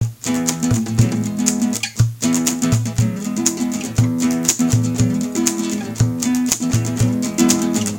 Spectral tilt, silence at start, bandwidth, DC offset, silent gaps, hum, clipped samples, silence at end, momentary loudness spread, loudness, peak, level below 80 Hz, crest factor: -4.5 dB/octave; 0 s; 17 kHz; under 0.1%; none; none; under 0.1%; 0 s; 4 LU; -18 LUFS; 0 dBFS; -40 dBFS; 18 dB